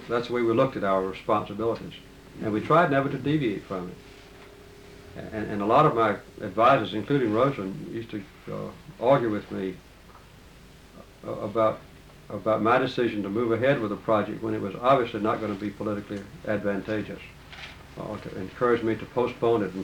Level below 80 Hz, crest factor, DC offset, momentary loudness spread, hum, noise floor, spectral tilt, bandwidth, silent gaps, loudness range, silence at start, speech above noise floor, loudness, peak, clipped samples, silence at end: -54 dBFS; 18 dB; under 0.1%; 18 LU; none; -50 dBFS; -7.5 dB/octave; 19 kHz; none; 6 LU; 0 s; 24 dB; -26 LUFS; -8 dBFS; under 0.1%; 0 s